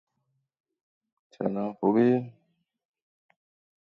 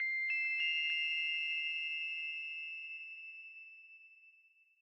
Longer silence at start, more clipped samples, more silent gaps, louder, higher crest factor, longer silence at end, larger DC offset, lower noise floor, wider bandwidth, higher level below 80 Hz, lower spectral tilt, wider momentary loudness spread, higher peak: first, 1.4 s vs 0 s; neither; neither; first, -26 LUFS vs -35 LUFS; first, 20 dB vs 14 dB; first, 1.65 s vs 0.5 s; neither; first, -78 dBFS vs -69 dBFS; second, 5.8 kHz vs 8.6 kHz; first, -76 dBFS vs under -90 dBFS; first, -10 dB/octave vs 7.5 dB/octave; second, 11 LU vs 19 LU; first, -10 dBFS vs -26 dBFS